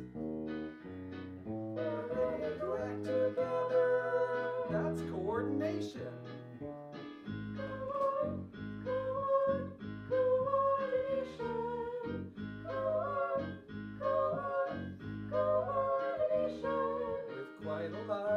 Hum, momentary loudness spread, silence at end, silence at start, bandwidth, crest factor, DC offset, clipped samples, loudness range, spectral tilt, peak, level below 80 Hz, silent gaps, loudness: none; 13 LU; 0 s; 0 s; 8 kHz; 16 dB; under 0.1%; under 0.1%; 5 LU; -8 dB/octave; -20 dBFS; -64 dBFS; none; -36 LUFS